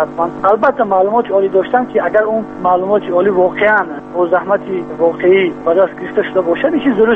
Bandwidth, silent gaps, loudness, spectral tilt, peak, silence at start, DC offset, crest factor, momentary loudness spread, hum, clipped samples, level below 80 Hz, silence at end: 4.1 kHz; none; -14 LUFS; -8 dB/octave; 0 dBFS; 0 s; under 0.1%; 12 dB; 5 LU; none; under 0.1%; -50 dBFS; 0 s